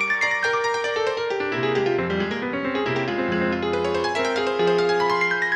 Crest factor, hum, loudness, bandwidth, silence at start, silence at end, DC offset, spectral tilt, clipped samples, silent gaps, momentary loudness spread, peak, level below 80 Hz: 12 dB; none; -22 LUFS; 10 kHz; 0 s; 0 s; under 0.1%; -5 dB/octave; under 0.1%; none; 4 LU; -10 dBFS; -56 dBFS